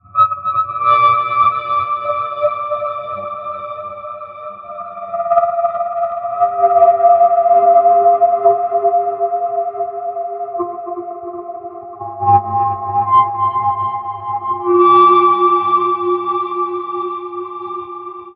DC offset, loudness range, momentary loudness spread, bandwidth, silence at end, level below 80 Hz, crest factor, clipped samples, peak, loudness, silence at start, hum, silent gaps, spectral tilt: under 0.1%; 9 LU; 17 LU; 4.9 kHz; 0.05 s; -62 dBFS; 14 dB; under 0.1%; 0 dBFS; -14 LUFS; 0.15 s; none; none; -9.5 dB/octave